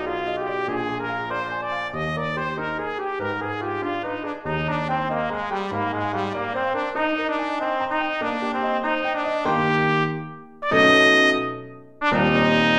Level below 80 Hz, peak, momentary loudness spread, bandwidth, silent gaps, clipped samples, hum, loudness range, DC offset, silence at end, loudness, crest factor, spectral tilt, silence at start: -52 dBFS; -4 dBFS; 9 LU; 12 kHz; none; under 0.1%; none; 7 LU; 0.1%; 0 s; -23 LUFS; 20 dB; -5.5 dB/octave; 0 s